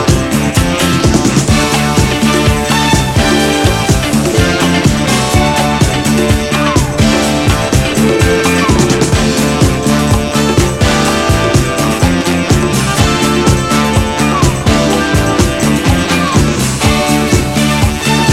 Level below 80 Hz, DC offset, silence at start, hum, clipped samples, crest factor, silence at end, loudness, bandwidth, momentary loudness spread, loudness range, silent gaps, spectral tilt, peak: -22 dBFS; under 0.1%; 0 s; none; under 0.1%; 10 dB; 0 s; -11 LUFS; 16.5 kHz; 2 LU; 1 LU; none; -4.5 dB/octave; 0 dBFS